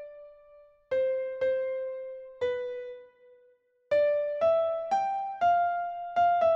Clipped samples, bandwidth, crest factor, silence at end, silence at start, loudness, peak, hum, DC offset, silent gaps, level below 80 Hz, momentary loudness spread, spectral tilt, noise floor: under 0.1%; 7 kHz; 14 dB; 0 s; 0 s; -29 LUFS; -16 dBFS; none; under 0.1%; none; -70 dBFS; 14 LU; -4.5 dB/octave; -65 dBFS